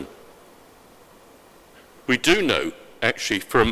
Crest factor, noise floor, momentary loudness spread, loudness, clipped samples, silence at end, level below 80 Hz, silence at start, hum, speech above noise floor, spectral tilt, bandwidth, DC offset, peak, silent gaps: 24 dB; -50 dBFS; 15 LU; -21 LUFS; under 0.1%; 0 s; -46 dBFS; 0 s; none; 30 dB; -3.5 dB/octave; 16 kHz; under 0.1%; 0 dBFS; none